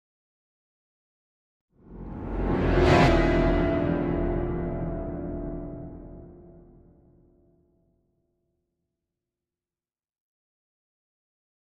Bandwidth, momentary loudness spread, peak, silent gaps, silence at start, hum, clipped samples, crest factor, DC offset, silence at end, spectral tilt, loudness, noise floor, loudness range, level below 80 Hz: 9 kHz; 22 LU; -6 dBFS; none; 1.9 s; none; under 0.1%; 22 dB; under 0.1%; 5.05 s; -7.5 dB/octave; -25 LUFS; under -90 dBFS; 16 LU; -36 dBFS